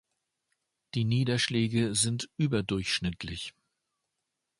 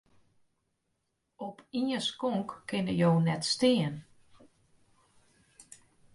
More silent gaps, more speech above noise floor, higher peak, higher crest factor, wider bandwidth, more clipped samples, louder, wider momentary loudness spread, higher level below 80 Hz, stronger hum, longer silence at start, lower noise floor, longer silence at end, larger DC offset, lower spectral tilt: neither; first, 55 dB vs 51 dB; about the same, -12 dBFS vs -14 dBFS; about the same, 20 dB vs 18 dB; about the same, 11.5 kHz vs 11.5 kHz; neither; about the same, -29 LUFS vs -30 LUFS; second, 11 LU vs 17 LU; first, -56 dBFS vs -68 dBFS; neither; second, 0.95 s vs 1.4 s; first, -84 dBFS vs -80 dBFS; first, 1.1 s vs 0.55 s; neither; about the same, -4.5 dB/octave vs -5.5 dB/octave